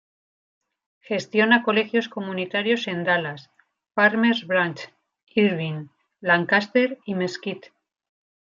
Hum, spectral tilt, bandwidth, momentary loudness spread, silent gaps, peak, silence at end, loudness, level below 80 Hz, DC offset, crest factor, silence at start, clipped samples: none; -6 dB/octave; 7.4 kHz; 15 LU; 5.23-5.27 s; -4 dBFS; 1 s; -22 LUFS; -74 dBFS; under 0.1%; 22 dB; 1.1 s; under 0.1%